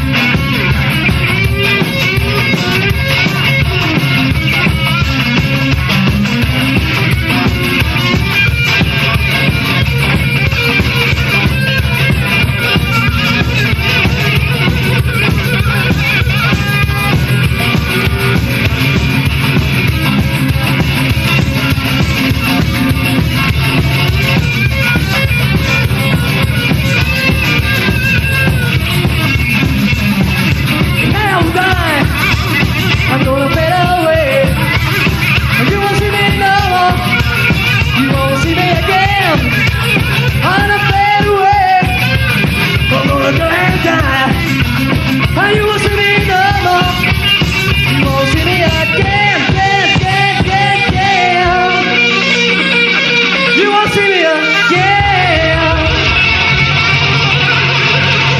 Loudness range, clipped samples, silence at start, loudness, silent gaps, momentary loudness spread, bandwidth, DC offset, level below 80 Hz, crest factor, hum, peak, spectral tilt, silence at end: 3 LU; under 0.1%; 0 s; -10 LUFS; none; 3 LU; 14.5 kHz; under 0.1%; -22 dBFS; 10 dB; none; 0 dBFS; -5 dB/octave; 0 s